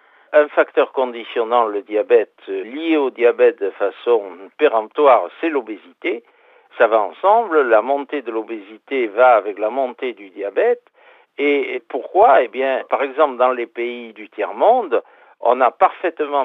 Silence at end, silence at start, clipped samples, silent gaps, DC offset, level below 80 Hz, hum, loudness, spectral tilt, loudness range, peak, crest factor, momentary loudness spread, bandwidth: 0 s; 0.3 s; under 0.1%; none; under 0.1%; -72 dBFS; none; -18 LUFS; -6 dB/octave; 2 LU; -2 dBFS; 16 dB; 13 LU; 4 kHz